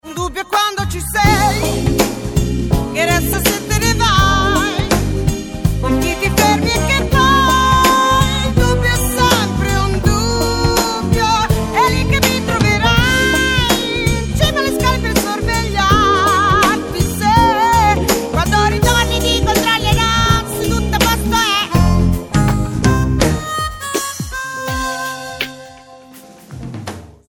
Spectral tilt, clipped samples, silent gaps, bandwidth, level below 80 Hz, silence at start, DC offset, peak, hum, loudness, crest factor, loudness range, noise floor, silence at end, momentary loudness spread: -4 dB/octave; under 0.1%; none; 17.5 kHz; -24 dBFS; 0.05 s; under 0.1%; 0 dBFS; none; -14 LUFS; 14 dB; 4 LU; -39 dBFS; 0.2 s; 8 LU